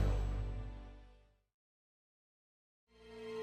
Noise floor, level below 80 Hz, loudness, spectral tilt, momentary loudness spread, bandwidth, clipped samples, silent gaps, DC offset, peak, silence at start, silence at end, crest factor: -65 dBFS; -44 dBFS; -43 LUFS; -7.5 dB/octave; 21 LU; 8.4 kHz; under 0.1%; 1.54-2.87 s; under 0.1%; -24 dBFS; 0 s; 0 s; 20 dB